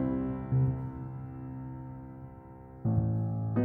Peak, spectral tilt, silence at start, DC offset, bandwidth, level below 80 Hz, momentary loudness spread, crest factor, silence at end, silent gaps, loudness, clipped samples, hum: -16 dBFS; -13 dB/octave; 0 s; under 0.1%; 2.8 kHz; -50 dBFS; 18 LU; 16 dB; 0 s; none; -33 LUFS; under 0.1%; none